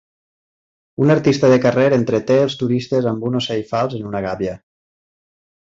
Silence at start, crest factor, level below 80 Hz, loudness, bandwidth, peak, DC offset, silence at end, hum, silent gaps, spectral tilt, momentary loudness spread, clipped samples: 1 s; 16 dB; -52 dBFS; -17 LUFS; 7.8 kHz; -2 dBFS; under 0.1%; 1.05 s; none; none; -7 dB/octave; 11 LU; under 0.1%